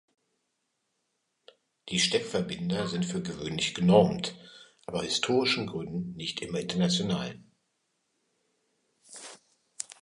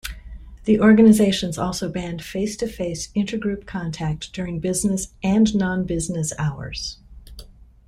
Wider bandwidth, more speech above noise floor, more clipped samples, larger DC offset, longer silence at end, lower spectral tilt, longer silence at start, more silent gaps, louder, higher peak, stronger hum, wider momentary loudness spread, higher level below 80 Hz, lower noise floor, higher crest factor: second, 11.5 kHz vs 15 kHz; first, 51 dB vs 23 dB; neither; neither; second, 0.1 s vs 0.4 s; about the same, -4.5 dB/octave vs -5.5 dB/octave; first, 1.85 s vs 0.05 s; neither; second, -28 LUFS vs -21 LUFS; second, -8 dBFS vs -4 dBFS; neither; first, 21 LU vs 15 LU; second, -62 dBFS vs -42 dBFS; first, -79 dBFS vs -43 dBFS; first, 24 dB vs 18 dB